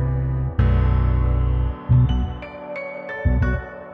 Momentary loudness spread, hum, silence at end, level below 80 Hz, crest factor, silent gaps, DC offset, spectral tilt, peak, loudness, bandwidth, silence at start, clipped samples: 12 LU; none; 0 s; -24 dBFS; 14 dB; none; under 0.1%; -10 dB/octave; -6 dBFS; -22 LUFS; 3.8 kHz; 0 s; under 0.1%